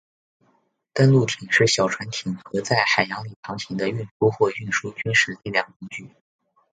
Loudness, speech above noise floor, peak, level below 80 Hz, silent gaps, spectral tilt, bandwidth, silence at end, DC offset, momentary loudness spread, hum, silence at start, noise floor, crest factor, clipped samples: -22 LUFS; 44 dB; -2 dBFS; -60 dBFS; 3.36-3.43 s, 4.11-4.20 s, 5.76-5.80 s; -4.5 dB/octave; 9.4 kHz; 0.65 s; under 0.1%; 15 LU; none; 0.95 s; -66 dBFS; 22 dB; under 0.1%